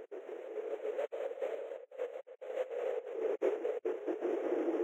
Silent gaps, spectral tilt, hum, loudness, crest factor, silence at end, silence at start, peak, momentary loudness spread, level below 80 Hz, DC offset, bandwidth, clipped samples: none; -4.5 dB/octave; none; -39 LUFS; 18 dB; 0 s; 0 s; -20 dBFS; 9 LU; under -90 dBFS; under 0.1%; 12 kHz; under 0.1%